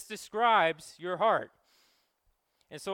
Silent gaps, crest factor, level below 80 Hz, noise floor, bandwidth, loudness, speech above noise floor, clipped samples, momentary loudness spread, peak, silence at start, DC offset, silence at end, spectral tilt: none; 20 dB; -78 dBFS; -75 dBFS; 16.5 kHz; -29 LUFS; 46 dB; under 0.1%; 20 LU; -12 dBFS; 0 s; under 0.1%; 0 s; -3.5 dB/octave